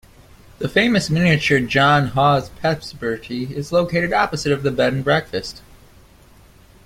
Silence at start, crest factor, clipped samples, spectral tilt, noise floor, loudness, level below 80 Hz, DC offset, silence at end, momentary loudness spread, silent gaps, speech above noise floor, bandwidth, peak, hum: 0.6 s; 18 dB; under 0.1%; -5.5 dB/octave; -48 dBFS; -18 LUFS; -46 dBFS; under 0.1%; 1.25 s; 11 LU; none; 30 dB; 16 kHz; -2 dBFS; none